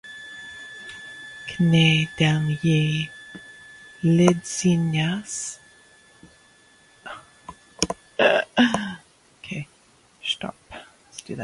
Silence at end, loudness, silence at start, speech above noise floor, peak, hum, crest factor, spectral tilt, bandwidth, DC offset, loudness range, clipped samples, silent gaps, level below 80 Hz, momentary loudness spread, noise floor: 0 s; -22 LUFS; 0.05 s; 37 dB; 0 dBFS; none; 24 dB; -5 dB/octave; 11.5 kHz; under 0.1%; 7 LU; under 0.1%; none; -56 dBFS; 24 LU; -57 dBFS